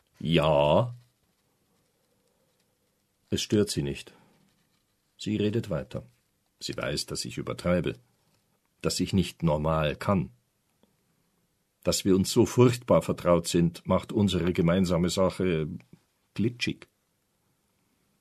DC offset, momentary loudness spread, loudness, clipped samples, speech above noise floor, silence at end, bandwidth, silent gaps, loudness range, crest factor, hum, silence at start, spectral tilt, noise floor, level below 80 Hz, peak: under 0.1%; 13 LU; -27 LUFS; under 0.1%; 48 dB; 1.45 s; 13.5 kHz; none; 9 LU; 22 dB; none; 0.2 s; -5.5 dB/octave; -74 dBFS; -52 dBFS; -6 dBFS